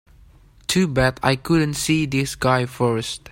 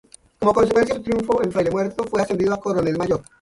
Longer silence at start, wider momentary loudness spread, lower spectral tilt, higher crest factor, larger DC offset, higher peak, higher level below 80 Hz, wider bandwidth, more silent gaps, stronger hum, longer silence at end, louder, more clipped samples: first, 0.7 s vs 0.4 s; about the same, 4 LU vs 6 LU; second, -5 dB/octave vs -6.5 dB/octave; about the same, 20 dB vs 16 dB; neither; about the same, -2 dBFS vs -4 dBFS; first, -42 dBFS vs -48 dBFS; first, 16.5 kHz vs 11.5 kHz; neither; neither; second, 0 s vs 0.2 s; about the same, -20 LUFS vs -21 LUFS; neither